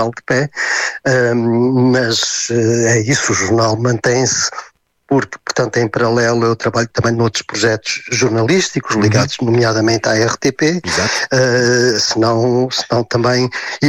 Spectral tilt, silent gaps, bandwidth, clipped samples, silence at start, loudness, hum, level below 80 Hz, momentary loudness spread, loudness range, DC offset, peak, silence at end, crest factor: -4 dB/octave; none; 13 kHz; under 0.1%; 0 s; -14 LUFS; none; -48 dBFS; 4 LU; 2 LU; under 0.1%; -2 dBFS; 0 s; 12 dB